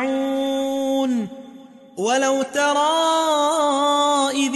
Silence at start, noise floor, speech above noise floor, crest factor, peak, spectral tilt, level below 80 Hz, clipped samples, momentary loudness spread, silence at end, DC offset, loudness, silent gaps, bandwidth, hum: 0 s; -43 dBFS; 24 dB; 12 dB; -8 dBFS; -2.5 dB/octave; -70 dBFS; under 0.1%; 8 LU; 0 s; under 0.1%; -19 LUFS; none; 12 kHz; none